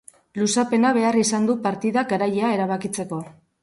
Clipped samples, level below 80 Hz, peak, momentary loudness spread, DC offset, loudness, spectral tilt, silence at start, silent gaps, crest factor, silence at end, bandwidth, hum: under 0.1%; -66 dBFS; -8 dBFS; 10 LU; under 0.1%; -21 LUFS; -4.5 dB/octave; 0.35 s; none; 14 dB; 0.3 s; 11.5 kHz; none